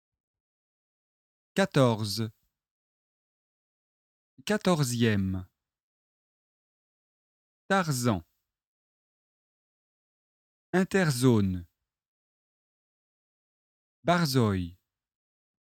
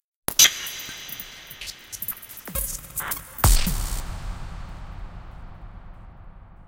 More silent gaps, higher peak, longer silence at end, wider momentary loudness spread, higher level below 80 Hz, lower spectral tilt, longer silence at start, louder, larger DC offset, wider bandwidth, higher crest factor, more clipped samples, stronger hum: first, 2.71-4.37 s, 5.83-7.69 s, 8.65-10.73 s, 12.08-14.03 s vs none; second, -8 dBFS vs 0 dBFS; first, 0.95 s vs 0 s; second, 10 LU vs 27 LU; second, -64 dBFS vs -32 dBFS; first, -5.5 dB/octave vs -1.5 dB/octave; first, 1.55 s vs 0.3 s; second, -27 LUFS vs -23 LUFS; neither; about the same, 17.5 kHz vs 17 kHz; about the same, 24 dB vs 26 dB; neither; neither